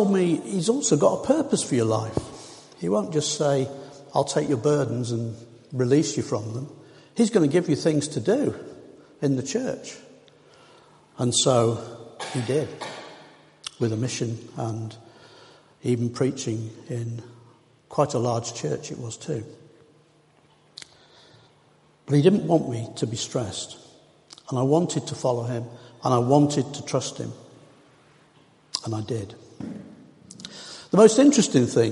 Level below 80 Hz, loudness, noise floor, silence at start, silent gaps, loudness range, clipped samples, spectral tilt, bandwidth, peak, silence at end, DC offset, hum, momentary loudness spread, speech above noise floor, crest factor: -62 dBFS; -24 LUFS; -59 dBFS; 0 s; none; 8 LU; under 0.1%; -5.5 dB/octave; 11.5 kHz; -2 dBFS; 0 s; under 0.1%; none; 19 LU; 36 dB; 24 dB